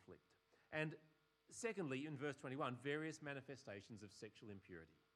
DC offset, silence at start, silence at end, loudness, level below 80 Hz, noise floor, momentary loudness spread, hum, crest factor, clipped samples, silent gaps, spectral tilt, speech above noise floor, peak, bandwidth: under 0.1%; 0 s; 0.25 s; -50 LUFS; -90 dBFS; -78 dBFS; 14 LU; none; 22 dB; under 0.1%; none; -5 dB/octave; 28 dB; -28 dBFS; 12.5 kHz